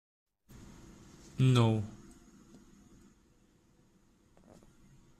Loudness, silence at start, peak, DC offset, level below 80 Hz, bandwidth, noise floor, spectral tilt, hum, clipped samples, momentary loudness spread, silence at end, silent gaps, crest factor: -30 LUFS; 1.4 s; -16 dBFS; under 0.1%; -62 dBFS; 11 kHz; -67 dBFS; -7 dB/octave; none; under 0.1%; 29 LU; 3.25 s; none; 22 dB